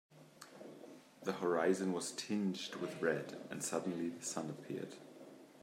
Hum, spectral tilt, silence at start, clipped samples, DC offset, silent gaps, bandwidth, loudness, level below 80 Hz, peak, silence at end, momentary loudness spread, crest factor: none; -4.5 dB/octave; 0.1 s; under 0.1%; under 0.1%; none; 16 kHz; -40 LUFS; -88 dBFS; -20 dBFS; 0.05 s; 21 LU; 20 dB